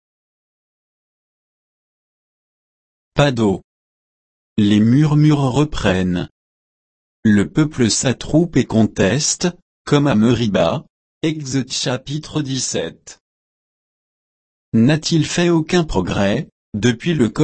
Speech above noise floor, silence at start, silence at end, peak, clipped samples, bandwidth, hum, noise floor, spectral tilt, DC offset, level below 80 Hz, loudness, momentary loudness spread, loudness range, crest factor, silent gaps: over 74 dB; 3.15 s; 0 s; -2 dBFS; under 0.1%; 8.8 kHz; none; under -90 dBFS; -5.5 dB/octave; under 0.1%; -42 dBFS; -17 LUFS; 10 LU; 7 LU; 16 dB; 3.64-4.56 s, 6.31-7.23 s, 9.62-9.85 s, 10.90-11.21 s, 13.20-14.72 s, 16.52-16.72 s